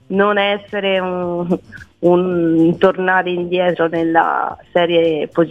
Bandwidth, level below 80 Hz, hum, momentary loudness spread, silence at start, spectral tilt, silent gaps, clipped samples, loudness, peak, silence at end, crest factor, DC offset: 4.9 kHz; -54 dBFS; none; 7 LU; 0.1 s; -8 dB/octave; none; under 0.1%; -16 LUFS; 0 dBFS; 0 s; 16 dB; 0.1%